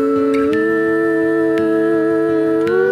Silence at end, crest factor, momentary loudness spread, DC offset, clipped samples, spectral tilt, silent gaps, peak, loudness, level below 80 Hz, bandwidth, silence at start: 0 s; 10 dB; 0 LU; under 0.1%; under 0.1%; -7 dB/octave; none; -4 dBFS; -15 LUFS; -56 dBFS; 9.8 kHz; 0 s